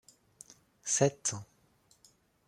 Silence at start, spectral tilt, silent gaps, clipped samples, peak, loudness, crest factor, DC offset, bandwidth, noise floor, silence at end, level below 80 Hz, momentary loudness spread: 0.85 s; -3.5 dB/octave; none; under 0.1%; -12 dBFS; -31 LUFS; 26 dB; under 0.1%; 14.5 kHz; -68 dBFS; 1.05 s; -74 dBFS; 25 LU